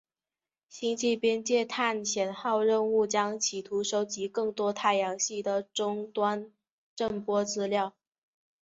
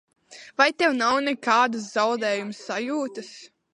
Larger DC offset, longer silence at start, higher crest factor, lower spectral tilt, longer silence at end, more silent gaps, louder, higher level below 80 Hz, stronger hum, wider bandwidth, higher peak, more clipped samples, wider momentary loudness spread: neither; first, 0.7 s vs 0.3 s; about the same, 18 dB vs 20 dB; about the same, -3 dB/octave vs -3 dB/octave; first, 0.75 s vs 0.25 s; first, 6.71-6.97 s vs none; second, -29 LUFS vs -23 LUFS; about the same, -72 dBFS vs -74 dBFS; neither; second, 8 kHz vs 11.5 kHz; second, -12 dBFS vs -4 dBFS; neither; second, 7 LU vs 13 LU